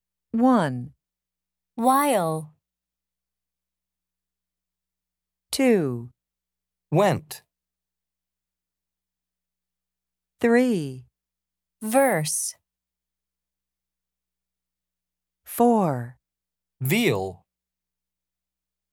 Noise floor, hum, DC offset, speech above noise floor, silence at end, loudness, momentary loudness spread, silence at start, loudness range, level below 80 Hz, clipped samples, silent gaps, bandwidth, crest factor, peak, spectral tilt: -89 dBFS; 60 Hz at -65 dBFS; under 0.1%; 67 dB; 1.6 s; -23 LUFS; 16 LU; 0.35 s; 5 LU; -68 dBFS; under 0.1%; none; 19 kHz; 20 dB; -6 dBFS; -5 dB/octave